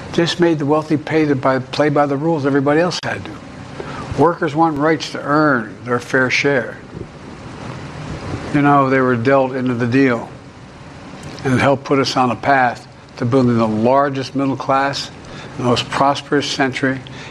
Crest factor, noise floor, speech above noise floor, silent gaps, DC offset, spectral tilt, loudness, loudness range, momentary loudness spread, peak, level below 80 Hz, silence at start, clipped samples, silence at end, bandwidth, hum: 16 dB; -37 dBFS; 21 dB; none; under 0.1%; -6 dB/octave; -16 LUFS; 2 LU; 18 LU; -2 dBFS; -48 dBFS; 0 s; under 0.1%; 0 s; 11.5 kHz; none